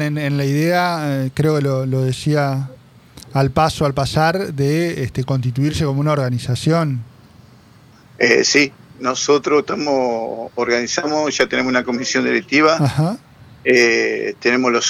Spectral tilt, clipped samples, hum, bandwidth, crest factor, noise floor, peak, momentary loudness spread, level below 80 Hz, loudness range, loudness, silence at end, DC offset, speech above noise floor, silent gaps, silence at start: -5 dB/octave; under 0.1%; none; 15.5 kHz; 16 dB; -46 dBFS; -2 dBFS; 8 LU; -46 dBFS; 3 LU; -17 LUFS; 0 s; under 0.1%; 30 dB; none; 0 s